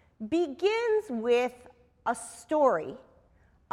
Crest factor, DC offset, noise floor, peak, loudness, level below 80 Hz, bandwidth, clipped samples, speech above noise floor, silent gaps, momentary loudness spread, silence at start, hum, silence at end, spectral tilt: 18 dB; under 0.1%; -63 dBFS; -12 dBFS; -29 LUFS; -66 dBFS; 13.5 kHz; under 0.1%; 35 dB; none; 11 LU; 0.2 s; none; 0.75 s; -4 dB/octave